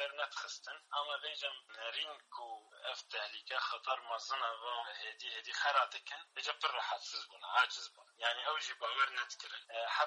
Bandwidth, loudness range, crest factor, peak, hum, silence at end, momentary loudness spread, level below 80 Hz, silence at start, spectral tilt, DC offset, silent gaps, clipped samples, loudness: 11 kHz; 5 LU; 22 dB; -18 dBFS; none; 0 s; 12 LU; under -90 dBFS; 0 s; 4 dB/octave; under 0.1%; none; under 0.1%; -39 LUFS